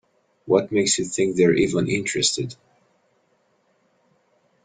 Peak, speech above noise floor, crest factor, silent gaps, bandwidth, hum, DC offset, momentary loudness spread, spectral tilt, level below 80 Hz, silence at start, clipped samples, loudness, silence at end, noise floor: -4 dBFS; 45 dB; 20 dB; none; 9.8 kHz; none; under 0.1%; 5 LU; -4 dB/octave; -58 dBFS; 0.45 s; under 0.1%; -21 LUFS; 2.1 s; -65 dBFS